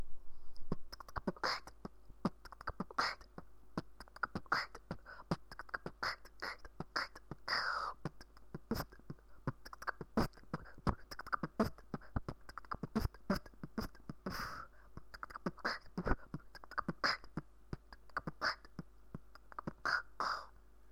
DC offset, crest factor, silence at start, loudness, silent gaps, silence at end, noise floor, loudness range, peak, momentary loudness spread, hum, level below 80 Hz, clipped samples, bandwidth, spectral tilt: 0.1%; 26 dB; 0 s; -43 LUFS; none; 0.3 s; -60 dBFS; 2 LU; -16 dBFS; 17 LU; none; -54 dBFS; under 0.1%; 18.5 kHz; -5 dB/octave